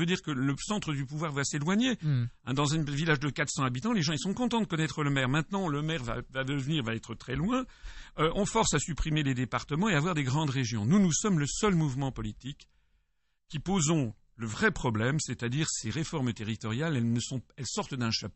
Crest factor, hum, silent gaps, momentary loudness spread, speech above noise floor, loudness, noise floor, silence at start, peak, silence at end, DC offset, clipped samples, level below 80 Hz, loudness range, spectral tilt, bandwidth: 18 dB; none; none; 8 LU; 47 dB; -30 LUFS; -77 dBFS; 0 s; -12 dBFS; 0.05 s; under 0.1%; under 0.1%; -50 dBFS; 4 LU; -5 dB/octave; 8.6 kHz